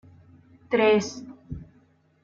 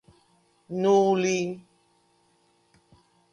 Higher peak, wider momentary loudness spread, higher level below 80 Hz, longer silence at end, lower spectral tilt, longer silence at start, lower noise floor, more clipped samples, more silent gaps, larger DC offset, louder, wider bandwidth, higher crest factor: about the same, -10 dBFS vs -10 dBFS; first, 21 LU vs 15 LU; first, -54 dBFS vs -74 dBFS; second, 0.6 s vs 1.75 s; about the same, -5 dB/octave vs -5.5 dB/octave; about the same, 0.7 s vs 0.7 s; second, -61 dBFS vs -66 dBFS; neither; neither; neither; about the same, -23 LUFS vs -24 LUFS; second, 7.6 kHz vs 10 kHz; about the same, 18 dB vs 18 dB